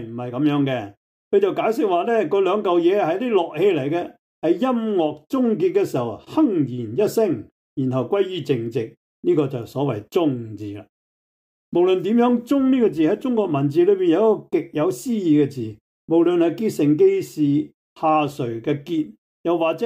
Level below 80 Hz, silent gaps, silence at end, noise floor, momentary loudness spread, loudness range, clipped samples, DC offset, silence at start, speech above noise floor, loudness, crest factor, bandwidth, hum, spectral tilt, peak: -66 dBFS; 0.97-1.31 s, 4.19-4.42 s, 7.52-7.76 s, 8.97-9.23 s, 10.89-11.72 s, 15.81-16.08 s, 17.74-17.96 s, 19.18-19.44 s; 0 s; under -90 dBFS; 9 LU; 4 LU; under 0.1%; under 0.1%; 0 s; over 70 dB; -21 LUFS; 14 dB; 16 kHz; none; -7.5 dB/octave; -6 dBFS